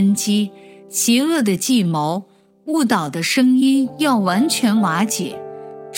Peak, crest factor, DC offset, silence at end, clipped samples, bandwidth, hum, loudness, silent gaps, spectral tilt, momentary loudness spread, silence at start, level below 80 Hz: -2 dBFS; 16 dB; under 0.1%; 0 s; under 0.1%; 17 kHz; none; -17 LUFS; none; -4 dB/octave; 12 LU; 0 s; -70 dBFS